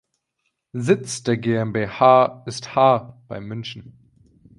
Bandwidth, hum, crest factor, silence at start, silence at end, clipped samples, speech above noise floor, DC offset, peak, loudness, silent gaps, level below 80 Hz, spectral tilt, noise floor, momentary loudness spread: 11.5 kHz; none; 20 dB; 0.75 s; 0.7 s; under 0.1%; 55 dB; under 0.1%; -2 dBFS; -19 LUFS; none; -58 dBFS; -5.5 dB/octave; -75 dBFS; 20 LU